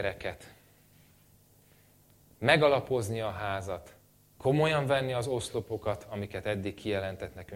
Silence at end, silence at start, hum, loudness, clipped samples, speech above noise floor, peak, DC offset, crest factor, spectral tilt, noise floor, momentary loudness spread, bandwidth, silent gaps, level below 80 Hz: 0 s; 0 s; 50 Hz at -55 dBFS; -31 LUFS; under 0.1%; 31 dB; -8 dBFS; under 0.1%; 24 dB; -5.5 dB/octave; -62 dBFS; 15 LU; 16.5 kHz; none; -58 dBFS